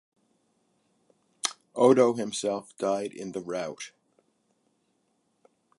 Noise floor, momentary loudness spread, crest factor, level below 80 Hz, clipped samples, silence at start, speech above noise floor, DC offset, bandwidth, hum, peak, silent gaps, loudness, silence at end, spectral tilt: -73 dBFS; 16 LU; 24 dB; -78 dBFS; under 0.1%; 1.45 s; 47 dB; under 0.1%; 11.5 kHz; none; -8 dBFS; none; -27 LUFS; 1.9 s; -4.5 dB/octave